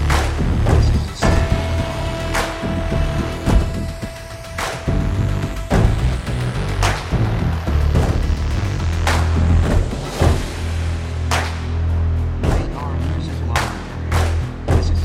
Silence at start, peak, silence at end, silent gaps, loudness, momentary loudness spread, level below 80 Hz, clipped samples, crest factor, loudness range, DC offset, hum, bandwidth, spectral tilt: 0 s; -2 dBFS; 0 s; none; -20 LUFS; 7 LU; -22 dBFS; under 0.1%; 16 dB; 3 LU; under 0.1%; none; 14.5 kHz; -6 dB/octave